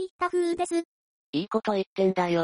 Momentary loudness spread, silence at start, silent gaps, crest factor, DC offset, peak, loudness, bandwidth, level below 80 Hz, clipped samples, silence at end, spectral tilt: 8 LU; 0 s; 0.10-0.19 s, 0.85-1.33 s, 1.86-1.96 s; 16 dB; under 0.1%; -10 dBFS; -27 LUFS; 10.5 kHz; -68 dBFS; under 0.1%; 0 s; -5.5 dB/octave